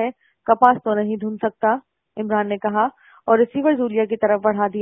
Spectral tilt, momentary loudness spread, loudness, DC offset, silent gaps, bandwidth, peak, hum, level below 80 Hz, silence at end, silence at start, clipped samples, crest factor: -9 dB/octave; 11 LU; -20 LUFS; under 0.1%; none; 3.6 kHz; 0 dBFS; none; -62 dBFS; 0 s; 0 s; under 0.1%; 20 dB